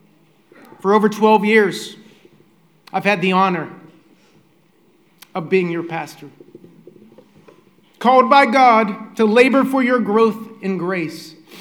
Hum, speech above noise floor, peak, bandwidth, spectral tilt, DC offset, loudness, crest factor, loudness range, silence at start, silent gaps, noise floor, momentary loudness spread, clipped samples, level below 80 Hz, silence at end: none; 40 dB; 0 dBFS; 17.5 kHz; -6 dB/octave; under 0.1%; -16 LUFS; 18 dB; 12 LU; 0.85 s; none; -56 dBFS; 17 LU; under 0.1%; -72 dBFS; 0 s